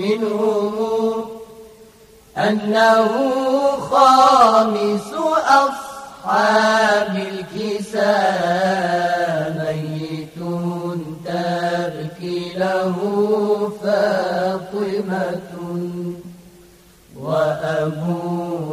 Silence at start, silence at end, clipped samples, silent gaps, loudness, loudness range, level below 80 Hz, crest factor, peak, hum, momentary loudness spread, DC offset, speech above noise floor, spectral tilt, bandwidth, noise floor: 0 s; 0 s; under 0.1%; none; -18 LUFS; 9 LU; -58 dBFS; 18 dB; 0 dBFS; none; 13 LU; under 0.1%; 31 dB; -5.5 dB/octave; 15.5 kHz; -48 dBFS